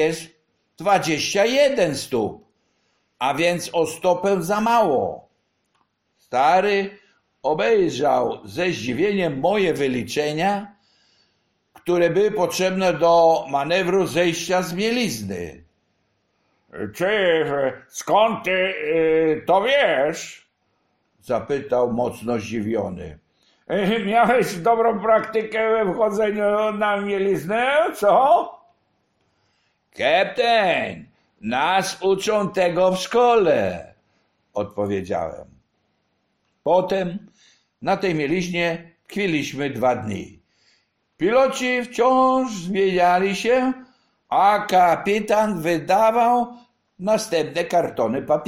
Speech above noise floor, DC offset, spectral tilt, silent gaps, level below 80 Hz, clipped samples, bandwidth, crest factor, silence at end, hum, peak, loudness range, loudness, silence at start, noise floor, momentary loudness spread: 50 dB; under 0.1%; -4.5 dB/octave; none; -56 dBFS; under 0.1%; 16 kHz; 16 dB; 0 s; none; -6 dBFS; 5 LU; -20 LUFS; 0 s; -70 dBFS; 12 LU